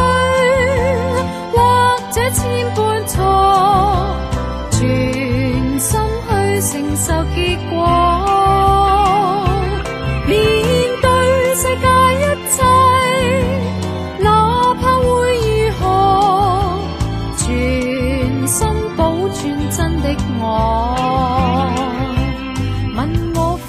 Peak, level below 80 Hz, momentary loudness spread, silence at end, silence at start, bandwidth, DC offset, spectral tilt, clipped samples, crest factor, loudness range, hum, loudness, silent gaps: -2 dBFS; -26 dBFS; 8 LU; 0 s; 0 s; 15.5 kHz; under 0.1%; -5 dB/octave; under 0.1%; 14 dB; 4 LU; none; -15 LUFS; none